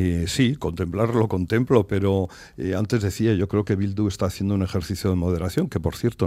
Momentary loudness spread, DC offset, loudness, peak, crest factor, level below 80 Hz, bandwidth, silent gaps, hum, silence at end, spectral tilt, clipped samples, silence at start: 6 LU; under 0.1%; -23 LUFS; -4 dBFS; 20 dB; -46 dBFS; 15.5 kHz; none; none; 0 s; -7 dB/octave; under 0.1%; 0 s